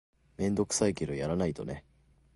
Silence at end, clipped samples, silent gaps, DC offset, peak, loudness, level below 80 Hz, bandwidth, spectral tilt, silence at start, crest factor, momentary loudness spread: 0.55 s; under 0.1%; none; under 0.1%; -14 dBFS; -32 LUFS; -52 dBFS; 11.5 kHz; -5 dB/octave; 0.4 s; 20 dB; 12 LU